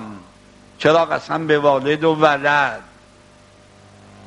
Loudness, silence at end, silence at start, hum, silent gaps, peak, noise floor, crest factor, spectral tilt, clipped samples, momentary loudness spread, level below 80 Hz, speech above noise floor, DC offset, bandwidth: -17 LUFS; 1.45 s; 0 s; 50 Hz at -50 dBFS; none; 0 dBFS; -48 dBFS; 20 dB; -5.5 dB/octave; under 0.1%; 7 LU; -58 dBFS; 32 dB; under 0.1%; 11 kHz